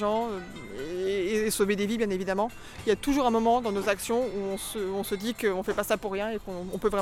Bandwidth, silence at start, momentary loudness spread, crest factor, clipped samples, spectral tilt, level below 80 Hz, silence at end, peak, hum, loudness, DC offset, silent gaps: 17 kHz; 0 s; 9 LU; 16 dB; under 0.1%; -4.5 dB/octave; -50 dBFS; 0 s; -12 dBFS; none; -29 LUFS; under 0.1%; none